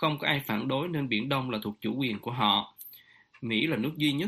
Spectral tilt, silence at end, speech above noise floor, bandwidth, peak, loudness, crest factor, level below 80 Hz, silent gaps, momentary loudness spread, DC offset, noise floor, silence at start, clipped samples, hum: -6 dB/octave; 0 s; 27 dB; 15.5 kHz; -8 dBFS; -29 LUFS; 20 dB; -66 dBFS; none; 11 LU; under 0.1%; -56 dBFS; 0 s; under 0.1%; none